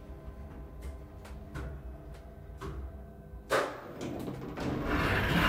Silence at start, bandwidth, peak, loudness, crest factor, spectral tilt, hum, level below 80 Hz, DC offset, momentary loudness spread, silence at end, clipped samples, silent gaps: 0 s; 16 kHz; -16 dBFS; -36 LUFS; 20 dB; -5.5 dB/octave; none; -44 dBFS; under 0.1%; 18 LU; 0 s; under 0.1%; none